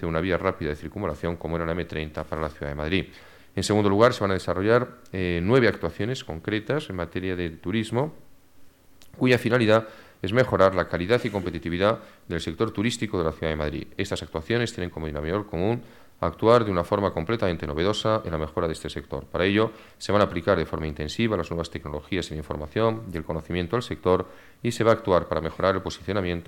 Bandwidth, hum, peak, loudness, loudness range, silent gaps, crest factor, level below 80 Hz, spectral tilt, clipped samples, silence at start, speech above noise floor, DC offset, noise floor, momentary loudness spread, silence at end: 17.5 kHz; none; -6 dBFS; -26 LUFS; 5 LU; none; 20 dB; -46 dBFS; -6 dB/octave; under 0.1%; 0 s; 26 dB; under 0.1%; -51 dBFS; 11 LU; 0.05 s